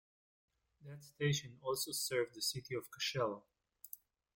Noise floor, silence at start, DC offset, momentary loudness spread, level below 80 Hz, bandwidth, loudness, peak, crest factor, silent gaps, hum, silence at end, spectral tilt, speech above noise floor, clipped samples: -59 dBFS; 0.8 s; under 0.1%; 18 LU; -76 dBFS; 17 kHz; -39 LUFS; -24 dBFS; 20 dB; none; none; 0.4 s; -3.5 dB/octave; 19 dB; under 0.1%